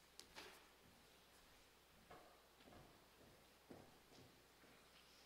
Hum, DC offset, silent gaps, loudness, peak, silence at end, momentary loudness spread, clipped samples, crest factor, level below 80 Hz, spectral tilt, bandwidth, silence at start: none; under 0.1%; none; -66 LUFS; -32 dBFS; 0 s; 8 LU; under 0.1%; 34 dB; -82 dBFS; -3 dB/octave; 16 kHz; 0 s